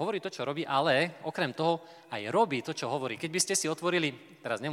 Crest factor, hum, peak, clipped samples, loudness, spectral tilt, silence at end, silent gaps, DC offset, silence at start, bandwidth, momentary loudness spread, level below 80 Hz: 20 dB; none; -12 dBFS; under 0.1%; -30 LUFS; -3.5 dB/octave; 0 s; none; under 0.1%; 0 s; 16.5 kHz; 8 LU; -84 dBFS